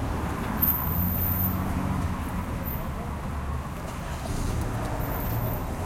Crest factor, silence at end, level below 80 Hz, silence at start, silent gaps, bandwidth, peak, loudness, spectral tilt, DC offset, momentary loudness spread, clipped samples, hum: 18 dB; 0 s; -36 dBFS; 0 s; none; 16.5 kHz; -10 dBFS; -28 LUFS; -6.5 dB/octave; under 0.1%; 9 LU; under 0.1%; none